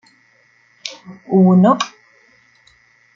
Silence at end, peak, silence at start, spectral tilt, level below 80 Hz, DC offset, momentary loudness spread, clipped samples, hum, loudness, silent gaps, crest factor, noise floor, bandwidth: 1.3 s; -2 dBFS; 0.85 s; -7 dB/octave; -64 dBFS; under 0.1%; 21 LU; under 0.1%; none; -14 LUFS; none; 16 dB; -55 dBFS; 7.4 kHz